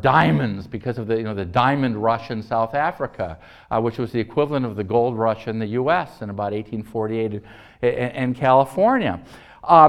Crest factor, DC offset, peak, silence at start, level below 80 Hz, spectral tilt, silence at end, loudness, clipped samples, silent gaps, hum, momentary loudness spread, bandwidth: 20 dB; under 0.1%; 0 dBFS; 0 s; -50 dBFS; -8 dB/octave; 0 s; -22 LUFS; under 0.1%; none; none; 12 LU; 13 kHz